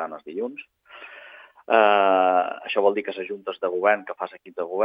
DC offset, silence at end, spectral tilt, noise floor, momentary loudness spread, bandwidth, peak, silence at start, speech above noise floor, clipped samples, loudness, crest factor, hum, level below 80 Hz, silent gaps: under 0.1%; 0 s; -7 dB/octave; -46 dBFS; 23 LU; 5.2 kHz; -4 dBFS; 0 s; 23 dB; under 0.1%; -23 LUFS; 20 dB; none; -82 dBFS; none